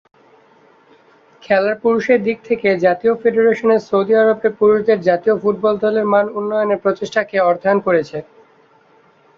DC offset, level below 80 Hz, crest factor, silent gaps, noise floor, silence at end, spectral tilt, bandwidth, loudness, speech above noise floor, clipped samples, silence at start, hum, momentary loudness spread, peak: under 0.1%; -60 dBFS; 14 dB; none; -52 dBFS; 1.15 s; -7 dB/octave; 7 kHz; -16 LUFS; 37 dB; under 0.1%; 1.5 s; none; 5 LU; -2 dBFS